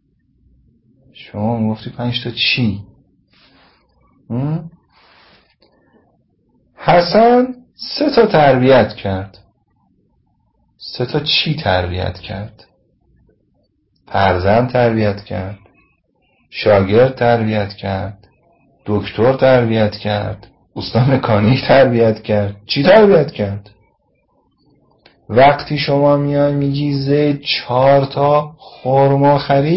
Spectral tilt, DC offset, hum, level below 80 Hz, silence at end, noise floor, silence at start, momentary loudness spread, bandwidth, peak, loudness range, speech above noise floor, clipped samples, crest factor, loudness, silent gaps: -10 dB/octave; under 0.1%; none; -40 dBFS; 0 s; -61 dBFS; 1.2 s; 15 LU; 5.8 kHz; 0 dBFS; 7 LU; 47 dB; under 0.1%; 16 dB; -14 LUFS; none